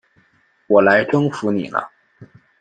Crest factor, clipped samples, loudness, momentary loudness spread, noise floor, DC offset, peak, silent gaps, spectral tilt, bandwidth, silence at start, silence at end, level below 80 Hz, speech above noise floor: 18 dB; under 0.1%; -17 LUFS; 12 LU; -59 dBFS; under 0.1%; -2 dBFS; none; -7 dB/octave; 9.2 kHz; 0.7 s; 0.35 s; -62 dBFS; 43 dB